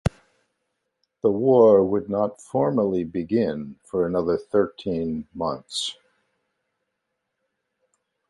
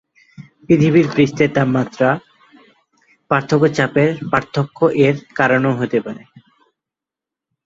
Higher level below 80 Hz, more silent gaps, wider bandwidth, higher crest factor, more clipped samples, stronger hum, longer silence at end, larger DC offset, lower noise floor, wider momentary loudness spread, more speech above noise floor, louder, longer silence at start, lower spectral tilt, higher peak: first, -48 dBFS vs -54 dBFS; neither; first, 11.5 kHz vs 7.8 kHz; about the same, 20 dB vs 16 dB; neither; neither; first, 2.4 s vs 1.45 s; neither; second, -79 dBFS vs -87 dBFS; first, 13 LU vs 7 LU; second, 57 dB vs 71 dB; second, -23 LUFS vs -16 LUFS; second, 0.05 s vs 0.4 s; about the same, -6.5 dB/octave vs -7 dB/octave; second, -4 dBFS vs 0 dBFS